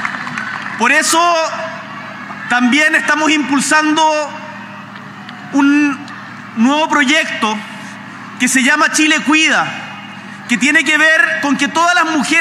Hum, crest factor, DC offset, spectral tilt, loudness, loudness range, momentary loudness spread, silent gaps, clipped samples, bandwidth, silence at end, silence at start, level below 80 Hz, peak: none; 14 dB; under 0.1%; -2 dB/octave; -12 LUFS; 4 LU; 19 LU; none; under 0.1%; 15.5 kHz; 0 s; 0 s; -70 dBFS; 0 dBFS